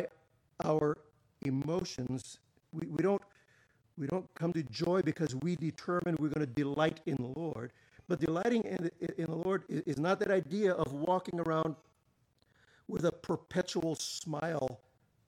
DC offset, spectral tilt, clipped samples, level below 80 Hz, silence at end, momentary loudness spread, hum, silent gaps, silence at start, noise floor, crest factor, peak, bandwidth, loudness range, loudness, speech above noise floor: under 0.1%; -6 dB/octave; under 0.1%; -66 dBFS; 0.5 s; 10 LU; none; none; 0 s; -74 dBFS; 18 dB; -18 dBFS; 15 kHz; 4 LU; -35 LUFS; 40 dB